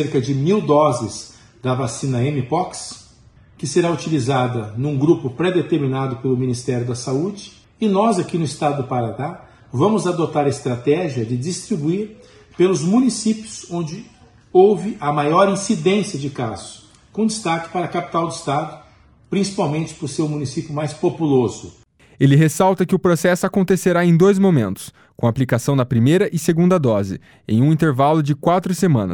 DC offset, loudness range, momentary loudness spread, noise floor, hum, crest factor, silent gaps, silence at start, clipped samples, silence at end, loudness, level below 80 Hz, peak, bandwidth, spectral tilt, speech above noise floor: under 0.1%; 6 LU; 11 LU; -50 dBFS; none; 18 dB; none; 0 s; under 0.1%; 0 s; -19 LUFS; -54 dBFS; 0 dBFS; 16.5 kHz; -6.5 dB/octave; 32 dB